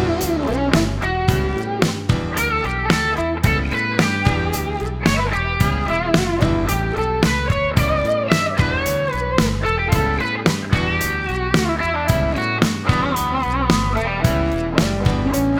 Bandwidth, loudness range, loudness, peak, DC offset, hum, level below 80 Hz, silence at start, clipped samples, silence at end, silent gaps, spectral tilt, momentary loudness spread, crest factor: over 20 kHz; 1 LU; -19 LUFS; 0 dBFS; under 0.1%; none; -28 dBFS; 0 s; under 0.1%; 0 s; none; -5.5 dB/octave; 3 LU; 18 dB